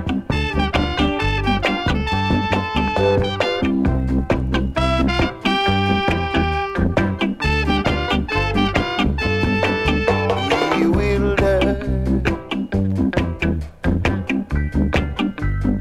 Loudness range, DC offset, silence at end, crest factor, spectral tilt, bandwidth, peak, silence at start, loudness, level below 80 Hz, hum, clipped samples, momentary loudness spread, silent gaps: 3 LU; under 0.1%; 0 s; 16 dB; -6.5 dB/octave; 12.5 kHz; -2 dBFS; 0 s; -19 LUFS; -26 dBFS; none; under 0.1%; 5 LU; none